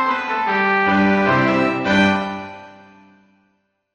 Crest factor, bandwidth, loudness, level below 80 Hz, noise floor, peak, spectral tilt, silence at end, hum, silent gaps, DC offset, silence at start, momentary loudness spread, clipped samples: 16 dB; 9.2 kHz; -17 LUFS; -54 dBFS; -66 dBFS; -4 dBFS; -6.5 dB/octave; 1.2 s; none; none; under 0.1%; 0 s; 10 LU; under 0.1%